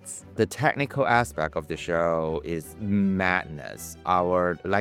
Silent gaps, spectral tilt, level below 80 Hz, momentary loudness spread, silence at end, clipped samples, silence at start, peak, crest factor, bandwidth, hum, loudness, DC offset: none; -5.5 dB/octave; -50 dBFS; 11 LU; 0 s; under 0.1%; 0.05 s; -6 dBFS; 20 dB; 16 kHz; none; -25 LUFS; under 0.1%